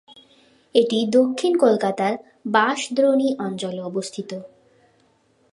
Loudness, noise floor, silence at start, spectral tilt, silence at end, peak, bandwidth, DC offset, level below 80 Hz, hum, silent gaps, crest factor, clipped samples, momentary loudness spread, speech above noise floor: -21 LUFS; -61 dBFS; 0.75 s; -4.5 dB/octave; 1.05 s; -2 dBFS; 11.5 kHz; under 0.1%; -74 dBFS; none; none; 20 dB; under 0.1%; 12 LU; 41 dB